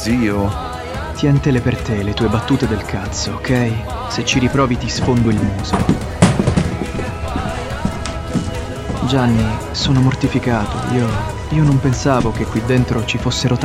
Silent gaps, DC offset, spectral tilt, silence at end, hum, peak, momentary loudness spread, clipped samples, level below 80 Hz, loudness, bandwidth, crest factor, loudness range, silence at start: none; under 0.1%; -6 dB/octave; 0 s; none; 0 dBFS; 8 LU; under 0.1%; -30 dBFS; -17 LUFS; 14 kHz; 16 dB; 3 LU; 0 s